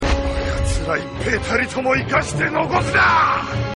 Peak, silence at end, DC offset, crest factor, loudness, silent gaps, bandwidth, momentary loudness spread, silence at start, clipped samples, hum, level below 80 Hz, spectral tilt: -4 dBFS; 0 s; under 0.1%; 16 dB; -18 LUFS; none; 11.5 kHz; 8 LU; 0 s; under 0.1%; none; -28 dBFS; -5 dB/octave